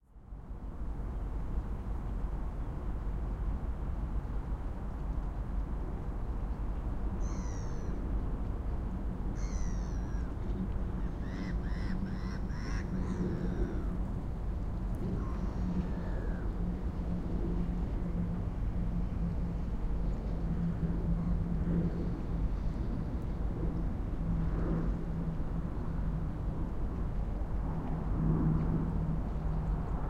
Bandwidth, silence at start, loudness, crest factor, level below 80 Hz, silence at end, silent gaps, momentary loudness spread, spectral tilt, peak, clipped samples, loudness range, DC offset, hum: 6.8 kHz; 0.15 s; -37 LUFS; 16 dB; -36 dBFS; 0 s; none; 6 LU; -8.5 dB/octave; -18 dBFS; under 0.1%; 4 LU; under 0.1%; none